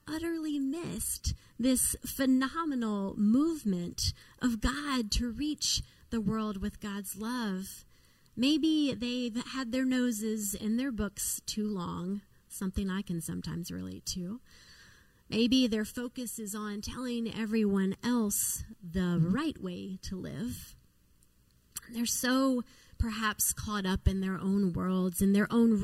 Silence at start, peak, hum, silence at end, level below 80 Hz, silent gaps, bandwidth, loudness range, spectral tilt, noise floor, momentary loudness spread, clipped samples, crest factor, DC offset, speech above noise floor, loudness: 0.05 s; -14 dBFS; none; 0 s; -48 dBFS; none; 16 kHz; 5 LU; -4.5 dB/octave; -65 dBFS; 11 LU; under 0.1%; 18 dB; under 0.1%; 34 dB; -32 LUFS